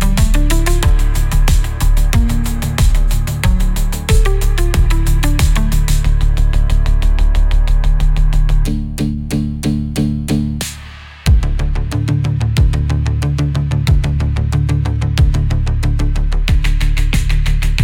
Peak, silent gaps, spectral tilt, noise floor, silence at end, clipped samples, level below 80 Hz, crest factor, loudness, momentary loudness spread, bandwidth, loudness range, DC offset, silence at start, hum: -2 dBFS; none; -5.5 dB/octave; -32 dBFS; 0 s; under 0.1%; -14 dBFS; 10 dB; -16 LUFS; 4 LU; 16.5 kHz; 2 LU; under 0.1%; 0 s; none